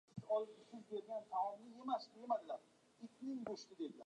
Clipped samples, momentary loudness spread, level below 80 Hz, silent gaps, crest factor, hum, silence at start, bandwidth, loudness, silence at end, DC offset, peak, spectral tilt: under 0.1%; 10 LU; -90 dBFS; none; 18 dB; none; 0.15 s; 10.5 kHz; -46 LUFS; 0 s; under 0.1%; -28 dBFS; -6 dB/octave